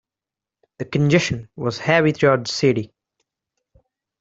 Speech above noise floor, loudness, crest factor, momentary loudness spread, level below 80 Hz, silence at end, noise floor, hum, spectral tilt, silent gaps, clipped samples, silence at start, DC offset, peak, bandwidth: 70 dB; -19 LUFS; 20 dB; 10 LU; -54 dBFS; 1.35 s; -88 dBFS; none; -5.5 dB/octave; none; under 0.1%; 0.8 s; under 0.1%; -2 dBFS; 8 kHz